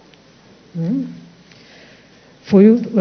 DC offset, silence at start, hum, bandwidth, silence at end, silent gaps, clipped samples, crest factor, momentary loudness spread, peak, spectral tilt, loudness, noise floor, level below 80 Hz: under 0.1%; 0.75 s; none; 6.4 kHz; 0 s; none; under 0.1%; 18 dB; 19 LU; 0 dBFS; -9.5 dB/octave; -15 LUFS; -47 dBFS; -58 dBFS